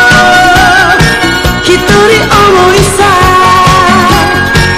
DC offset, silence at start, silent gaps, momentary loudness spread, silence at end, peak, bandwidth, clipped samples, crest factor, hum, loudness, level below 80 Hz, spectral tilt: under 0.1%; 0 s; none; 4 LU; 0 s; 0 dBFS; 16 kHz; 7%; 4 dB; none; -4 LUFS; -20 dBFS; -4 dB/octave